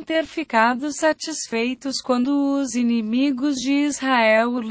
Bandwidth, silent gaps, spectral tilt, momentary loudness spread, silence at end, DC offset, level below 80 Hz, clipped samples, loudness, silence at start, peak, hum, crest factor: 8 kHz; none; -3 dB/octave; 7 LU; 0 s; under 0.1%; -62 dBFS; under 0.1%; -21 LUFS; 0 s; -4 dBFS; none; 16 dB